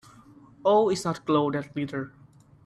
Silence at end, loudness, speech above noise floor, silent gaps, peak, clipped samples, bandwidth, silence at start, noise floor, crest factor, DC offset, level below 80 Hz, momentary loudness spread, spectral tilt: 0.55 s; -26 LUFS; 27 dB; none; -10 dBFS; under 0.1%; 13 kHz; 0.65 s; -52 dBFS; 18 dB; under 0.1%; -66 dBFS; 12 LU; -6 dB/octave